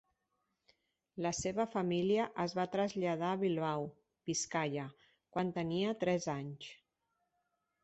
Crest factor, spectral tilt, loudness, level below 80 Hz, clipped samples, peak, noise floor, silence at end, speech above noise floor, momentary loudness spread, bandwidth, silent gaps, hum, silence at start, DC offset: 18 dB; -5 dB/octave; -36 LUFS; -70 dBFS; under 0.1%; -20 dBFS; -84 dBFS; 1.1 s; 48 dB; 13 LU; 8.2 kHz; none; none; 1.15 s; under 0.1%